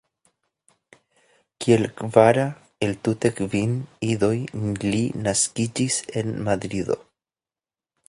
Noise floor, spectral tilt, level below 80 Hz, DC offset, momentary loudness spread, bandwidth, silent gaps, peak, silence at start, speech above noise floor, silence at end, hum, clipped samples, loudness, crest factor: under -90 dBFS; -5 dB/octave; -54 dBFS; under 0.1%; 10 LU; 11.5 kHz; none; 0 dBFS; 1.6 s; over 68 dB; 1.1 s; none; under 0.1%; -23 LUFS; 24 dB